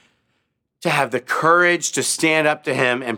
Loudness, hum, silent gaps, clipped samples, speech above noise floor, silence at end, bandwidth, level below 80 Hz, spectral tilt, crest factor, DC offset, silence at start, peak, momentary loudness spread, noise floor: -18 LUFS; none; none; under 0.1%; 53 dB; 0 s; 18 kHz; -74 dBFS; -3 dB/octave; 18 dB; under 0.1%; 0.8 s; -2 dBFS; 6 LU; -71 dBFS